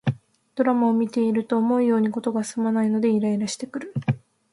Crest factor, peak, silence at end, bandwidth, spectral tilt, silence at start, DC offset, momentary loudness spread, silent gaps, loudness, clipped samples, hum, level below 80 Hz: 14 dB; -8 dBFS; 0.35 s; 11.5 kHz; -6.5 dB/octave; 0.05 s; under 0.1%; 10 LU; none; -23 LUFS; under 0.1%; none; -64 dBFS